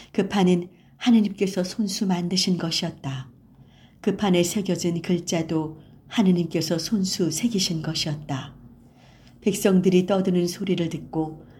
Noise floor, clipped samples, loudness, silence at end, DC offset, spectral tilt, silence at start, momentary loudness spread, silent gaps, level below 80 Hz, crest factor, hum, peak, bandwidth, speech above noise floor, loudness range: -51 dBFS; under 0.1%; -24 LUFS; 0.05 s; under 0.1%; -5 dB/octave; 0 s; 10 LU; none; -58 dBFS; 18 dB; none; -6 dBFS; 16 kHz; 28 dB; 2 LU